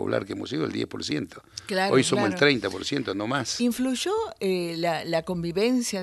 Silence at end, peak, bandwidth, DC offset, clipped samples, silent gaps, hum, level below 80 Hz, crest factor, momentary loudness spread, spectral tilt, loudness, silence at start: 0 s; -4 dBFS; 13 kHz; under 0.1%; under 0.1%; none; none; -60 dBFS; 20 dB; 9 LU; -4.5 dB/octave; -26 LUFS; 0 s